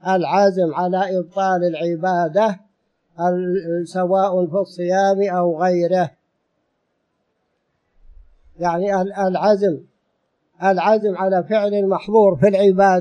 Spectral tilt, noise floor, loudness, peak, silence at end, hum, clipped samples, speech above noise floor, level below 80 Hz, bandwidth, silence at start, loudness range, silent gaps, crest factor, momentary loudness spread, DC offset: -7 dB/octave; -70 dBFS; -18 LUFS; -4 dBFS; 0 s; none; under 0.1%; 53 dB; -58 dBFS; 9.4 kHz; 0.05 s; 6 LU; none; 16 dB; 7 LU; under 0.1%